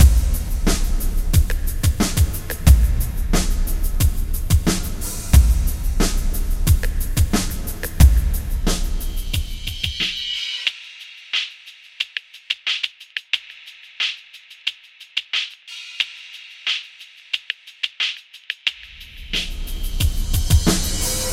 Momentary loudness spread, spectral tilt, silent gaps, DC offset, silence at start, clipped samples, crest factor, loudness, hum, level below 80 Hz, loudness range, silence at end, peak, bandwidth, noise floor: 15 LU; -4 dB/octave; none; under 0.1%; 0 s; under 0.1%; 20 dB; -22 LUFS; none; -20 dBFS; 6 LU; 0 s; 0 dBFS; 16.5 kHz; -44 dBFS